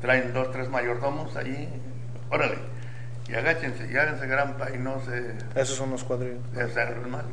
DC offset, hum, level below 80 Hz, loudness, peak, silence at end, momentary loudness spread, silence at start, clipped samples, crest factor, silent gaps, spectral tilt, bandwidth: 2%; none; -58 dBFS; -29 LUFS; -8 dBFS; 0 s; 12 LU; 0 s; under 0.1%; 20 dB; none; -5 dB/octave; 10 kHz